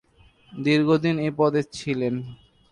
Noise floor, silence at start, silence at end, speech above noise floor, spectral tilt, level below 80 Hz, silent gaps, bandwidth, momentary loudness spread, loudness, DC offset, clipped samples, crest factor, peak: -56 dBFS; 0.5 s; 0.35 s; 34 dB; -6.5 dB/octave; -60 dBFS; none; 10.5 kHz; 13 LU; -23 LUFS; under 0.1%; under 0.1%; 16 dB; -8 dBFS